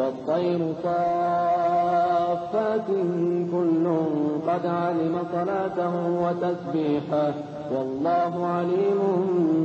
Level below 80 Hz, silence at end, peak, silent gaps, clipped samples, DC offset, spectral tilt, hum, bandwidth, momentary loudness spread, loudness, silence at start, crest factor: -66 dBFS; 0 s; -12 dBFS; none; under 0.1%; under 0.1%; -8.5 dB/octave; none; 7.6 kHz; 4 LU; -24 LUFS; 0 s; 12 dB